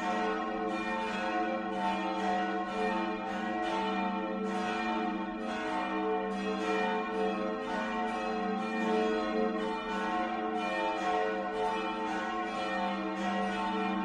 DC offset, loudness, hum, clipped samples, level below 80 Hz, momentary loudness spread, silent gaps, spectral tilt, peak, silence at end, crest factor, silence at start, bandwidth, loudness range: under 0.1%; -33 LUFS; none; under 0.1%; -62 dBFS; 3 LU; none; -5.5 dB/octave; -20 dBFS; 0 s; 14 dB; 0 s; 10.5 kHz; 1 LU